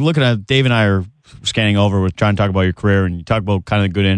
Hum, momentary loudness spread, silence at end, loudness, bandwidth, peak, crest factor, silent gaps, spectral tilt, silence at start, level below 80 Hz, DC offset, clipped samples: none; 6 LU; 0 s; -16 LUFS; 9.8 kHz; -2 dBFS; 12 dB; none; -6.5 dB/octave; 0 s; -42 dBFS; under 0.1%; under 0.1%